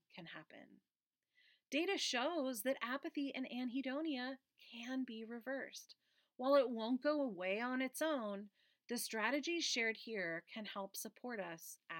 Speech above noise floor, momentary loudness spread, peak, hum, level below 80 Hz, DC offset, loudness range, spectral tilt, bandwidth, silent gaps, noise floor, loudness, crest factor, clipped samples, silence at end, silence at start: 37 dB; 15 LU; -22 dBFS; none; under -90 dBFS; under 0.1%; 4 LU; -2.5 dB/octave; 17 kHz; 0.96-1.00 s; -78 dBFS; -41 LUFS; 20 dB; under 0.1%; 0 s; 0.15 s